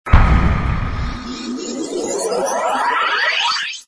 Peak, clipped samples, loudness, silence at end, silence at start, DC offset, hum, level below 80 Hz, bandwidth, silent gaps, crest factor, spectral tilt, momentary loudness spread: 0 dBFS; 0.2%; -18 LUFS; 0.05 s; 0.05 s; under 0.1%; none; -22 dBFS; 11 kHz; none; 18 dB; -4.5 dB/octave; 11 LU